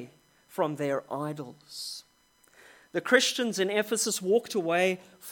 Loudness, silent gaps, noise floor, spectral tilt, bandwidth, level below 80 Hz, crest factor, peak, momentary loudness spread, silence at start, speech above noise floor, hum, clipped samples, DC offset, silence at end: -28 LUFS; none; -64 dBFS; -3 dB/octave; 17.5 kHz; -80 dBFS; 24 dB; -6 dBFS; 17 LU; 0 s; 36 dB; none; under 0.1%; under 0.1%; 0 s